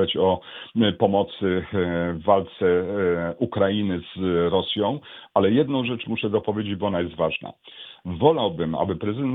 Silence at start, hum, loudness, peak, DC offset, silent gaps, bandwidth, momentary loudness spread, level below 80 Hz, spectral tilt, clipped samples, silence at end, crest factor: 0 s; none; -23 LUFS; -2 dBFS; under 0.1%; none; 4.1 kHz; 8 LU; -54 dBFS; -10 dB/octave; under 0.1%; 0 s; 20 dB